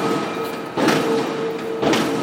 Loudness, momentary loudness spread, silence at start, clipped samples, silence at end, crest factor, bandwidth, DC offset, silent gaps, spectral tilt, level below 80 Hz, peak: -21 LUFS; 7 LU; 0 s; under 0.1%; 0 s; 18 dB; 16.5 kHz; under 0.1%; none; -4.5 dB/octave; -60 dBFS; -2 dBFS